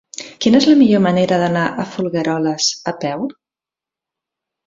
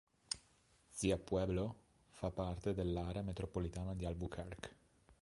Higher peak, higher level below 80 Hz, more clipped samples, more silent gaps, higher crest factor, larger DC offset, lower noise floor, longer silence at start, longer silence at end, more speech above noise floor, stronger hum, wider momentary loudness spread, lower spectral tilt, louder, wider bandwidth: first, 0 dBFS vs -22 dBFS; about the same, -56 dBFS vs -54 dBFS; neither; neither; second, 16 dB vs 22 dB; neither; first, -88 dBFS vs -72 dBFS; about the same, 0.2 s vs 0.3 s; first, 1.35 s vs 0.1 s; first, 73 dB vs 31 dB; neither; about the same, 12 LU vs 11 LU; about the same, -5 dB/octave vs -6 dB/octave; first, -16 LUFS vs -42 LUFS; second, 7.8 kHz vs 11.5 kHz